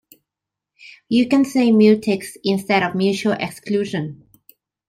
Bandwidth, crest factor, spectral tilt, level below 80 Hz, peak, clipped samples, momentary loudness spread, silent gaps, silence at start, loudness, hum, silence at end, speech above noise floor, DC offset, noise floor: 16 kHz; 16 dB; -6 dB/octave; -62 dBFS; -4 dBFS; under 0.1%; 11 LU; none; 0.85 s; -18 LUFS; none; 0.75 s; 67 dB; under 0.1%; -85 dBFS